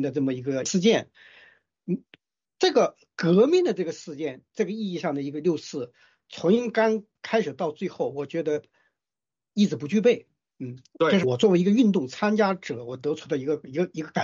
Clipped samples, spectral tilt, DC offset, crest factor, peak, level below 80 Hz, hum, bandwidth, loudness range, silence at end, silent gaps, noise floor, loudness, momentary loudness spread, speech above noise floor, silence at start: under 0.1%; -5.5 dB/octave; under 0.1%; 16 dB; -8 dBFS; -72 dBFS; none; 7.6 kHz; 4 LU; 0 s; none; under -90 dBFS; -25 LUFS; 13 LU; over 66 dB; 0 s